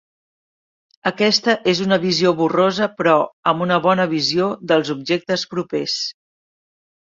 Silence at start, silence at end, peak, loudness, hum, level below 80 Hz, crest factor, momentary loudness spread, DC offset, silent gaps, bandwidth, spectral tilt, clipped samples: 1.05 s; 0.9 s; -2 dBFS; -18 LUFS; none; -62 dBFS; 16 dB; 7 LU; under 0.1%; 3.33-3.43 s; 7.8 kHz; -4.5 dB/octave; under 0.1%